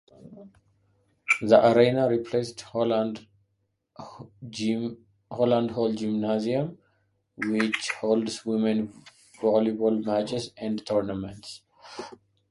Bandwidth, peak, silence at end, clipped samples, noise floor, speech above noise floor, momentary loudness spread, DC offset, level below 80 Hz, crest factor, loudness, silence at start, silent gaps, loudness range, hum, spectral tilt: 11.5 kHz; -4 dBFS; 0.4 s; under 0.1%; -75 dBFS; 50 dB; 21 LU; under 0.1%; -64 dBFS; 24 dB; -26 LUFS; 0.25 s; none; 5 LU; none; -5.5 dB/octave